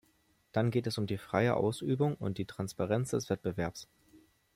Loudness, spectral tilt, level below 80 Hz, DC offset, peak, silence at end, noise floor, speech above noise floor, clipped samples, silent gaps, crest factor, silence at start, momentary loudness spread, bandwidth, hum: -33 LUFS; -6.5 dB/octave; -64 dBFS; under 0.1%; -14 dBFS; 0.35 s; -71 dBFS; 38 dB; under 0.1%; none; 18 dB; 0.55 s; 8 LU; 16 kHz; none